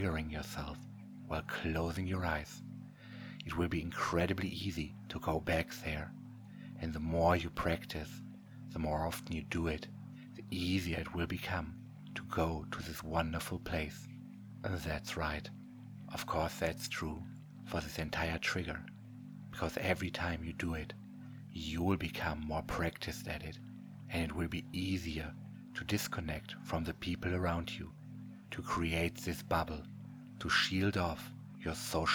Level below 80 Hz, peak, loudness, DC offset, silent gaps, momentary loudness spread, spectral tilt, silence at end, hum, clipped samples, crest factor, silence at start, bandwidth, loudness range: -52 dBFS; -16 dBFS; -38 LUFS; under 0.1%; none; 16 LU; -5 dB/octave; 0 s; none; under 0.1%; 24 dB; 0 s; over 20 kHz; 3 LU